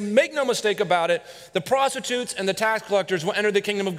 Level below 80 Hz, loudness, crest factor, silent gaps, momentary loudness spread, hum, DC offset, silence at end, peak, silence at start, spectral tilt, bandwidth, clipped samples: -68 dBFS; -23 LUFS; 18 dB; none; 5 LU; none; under 0.1%; 0 s; -4 dBFS; 0 s; -3.5 dB/octave; 16 kHz; under 0.1%